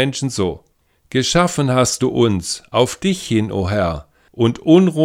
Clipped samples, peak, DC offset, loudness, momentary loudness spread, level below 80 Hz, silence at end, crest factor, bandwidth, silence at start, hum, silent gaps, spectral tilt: under 0.1%; 0 dBFS; under 0.1%; -17 LUFS; 9 LU; -42 dBFS; 0 s; 16 dB; 16 kHz; 0 s; none; none; -5 dB/octave